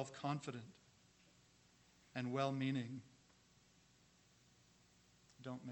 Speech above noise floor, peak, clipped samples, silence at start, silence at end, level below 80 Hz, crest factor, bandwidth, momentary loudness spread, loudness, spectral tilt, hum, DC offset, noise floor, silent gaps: 28 dB; -26 dBFS; under 0.1%; 0 s; 0 s; -84 dBFS; 22 dB; 18 kHz; 15 LU; -45 LUFS; -6 dB/octave; 60 Hz at -75 dBFS; under 0.1%; -72 dBFS; none